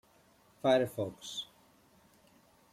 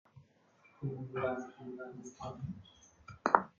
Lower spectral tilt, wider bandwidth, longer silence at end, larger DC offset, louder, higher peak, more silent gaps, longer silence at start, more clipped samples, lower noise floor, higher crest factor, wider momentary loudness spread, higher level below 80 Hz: about the same, -5 dB/octave vs -5.5 dB/octave; first, 16 kHz vs 7.4 kHz; first, 1.3 s vs 0.1 s; neither; first, -33 LUFS vs -39 LUFS; second, -16 dBFS vs -4 dBFS; neither; first, 0.65 s vs 0.15 s; neither; about the same, -66 dBFS vs -67 dBFS; second, 22 dB vs 36 dB; second, 13 LU vs 21 LU; about the same, -74 dBFS vs -70 dBFS